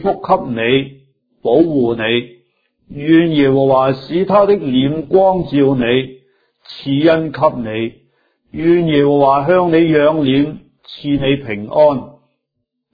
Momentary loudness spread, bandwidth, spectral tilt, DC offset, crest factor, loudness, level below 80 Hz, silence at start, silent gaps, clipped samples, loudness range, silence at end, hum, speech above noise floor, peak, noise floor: 12 LU; 5 kHz; -9.5 dB/octave; under 0.1%; 14 dB; -14 LUFS; -46 dBFS; 0 s; none; under 0.1%; 3 LU; 0.85 s; none; 60 dB; 0 dBFS; -73 dBFS